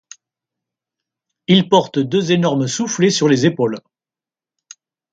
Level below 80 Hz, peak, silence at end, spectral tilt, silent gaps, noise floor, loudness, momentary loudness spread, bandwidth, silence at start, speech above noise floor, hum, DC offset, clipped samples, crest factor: -60 dBFS; 0 dBFS; 1.35 s; -5 dB/octave; none; under -90 dBFS; -16 LUFS; 8 LU; 9.2 kHz; 1.5 s; over 75 dB; none; under 0.1%; under 0.1%; 18 dB